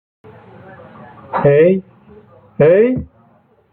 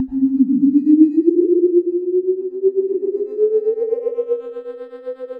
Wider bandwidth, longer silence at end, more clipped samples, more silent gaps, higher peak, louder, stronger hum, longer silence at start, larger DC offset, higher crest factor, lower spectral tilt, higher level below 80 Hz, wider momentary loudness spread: first, 4.1 kHz vs 2.6 kHz; first, 0.65 s vs 0 s; neither; neither; about the same, -2 dBFS vs 0 dBFS; first, -13 LUFS vs -17 LUFS; neither; first, 1.3 s vs 0 s; neither; about the same, 16 dB vs 16 dB; about the same, -12 dB/octave vs -11.5 dB/octave; first, -48 dBFS vs -60 dBFS; about the same, 18 LU vs 17 LU